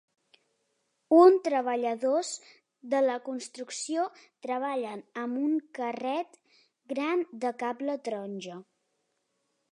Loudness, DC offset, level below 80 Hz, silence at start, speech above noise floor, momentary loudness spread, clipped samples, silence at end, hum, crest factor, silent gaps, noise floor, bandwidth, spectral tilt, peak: -29 LUFS; under 0.1%; -88 dBFS; 1.1 s; 47 dB; 16 LU; under 0.1%; 1.1 s; none; 22 dB; none; -78 dBFS; 11 kHz; -4 dB/octave; -8 dBFS